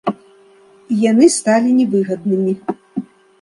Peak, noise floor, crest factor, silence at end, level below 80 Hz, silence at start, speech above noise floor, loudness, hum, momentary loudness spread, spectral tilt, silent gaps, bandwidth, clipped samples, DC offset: 0 dBFS; -47 dBFS; 16 dB; 0.4 s; -62 dBFS; 0.05 s; 34 dB; -15 LUFS; none; 16 LU; -5.5 dB/octave; none; 11.5 kHz; under 0.1%; under 0.1%